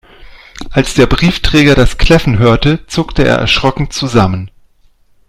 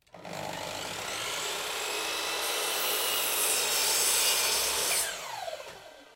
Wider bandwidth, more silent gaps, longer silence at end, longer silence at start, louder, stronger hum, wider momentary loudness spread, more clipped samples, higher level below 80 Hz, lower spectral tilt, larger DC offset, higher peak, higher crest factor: second, 14.5 kHz vs 16 kHz; neither; first, 0.8 s vs 0 s; about the same, 0.2 s vs 0.15 s; first, -11 LUFS vs -27 LUFS; neither; second, 8 LU vs 14 LU; first, 0.5% vs under 0.1%; first, -20 dBFS vs -64 dBFS; first, -5.5 dB/octave vs 1 dB/octave; neither; first, 0 dBFS vs -14 dBFS; second, 10 dB vs 18 dB